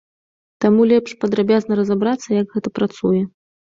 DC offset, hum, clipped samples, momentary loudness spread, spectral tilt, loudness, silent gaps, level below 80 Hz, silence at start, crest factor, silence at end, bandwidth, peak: under 0.1%; none; under 0.1%; 7 LU; -7 dB/octave; -18 LUFS; none; -58 dBFS; 0.6 s; 16 dB; 0.5 s; 7.6 kHz; -2 dBFS